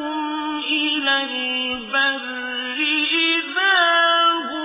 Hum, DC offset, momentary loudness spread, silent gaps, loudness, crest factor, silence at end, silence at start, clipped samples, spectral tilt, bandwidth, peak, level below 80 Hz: none; under 0.1%; 10 LU; none; -18 LUFS; 16 dB; 0 s; 0 s; under 0.1%; -4.5 dB/octave; 3.9 kHz; -4 dBFS; -64 dBFS